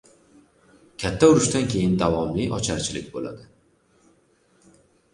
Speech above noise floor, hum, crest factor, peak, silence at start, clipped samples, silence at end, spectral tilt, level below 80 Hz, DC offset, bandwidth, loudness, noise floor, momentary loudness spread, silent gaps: 40 dB; none; 22 dB; -4 dBFS; 1 s; under 0.1%; 1.7 s; -5 dB/octave; -46 dBFS; under 0.1%; 11.5 kHz; -22 LUFS; -62 dBFS; 18 LU; none